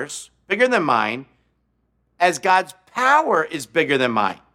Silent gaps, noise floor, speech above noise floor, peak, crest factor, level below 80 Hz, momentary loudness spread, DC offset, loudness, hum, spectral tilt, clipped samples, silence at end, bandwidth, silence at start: none; -67 dBFS; 48 dB; -2 dBFS; 18 dB; -68 dBFS; 12 LU; under 0.1%; -19 LUFS; none; -3.5 dB/octave; under 0.1%; 0.2 s; 15.5 kHz; 0 s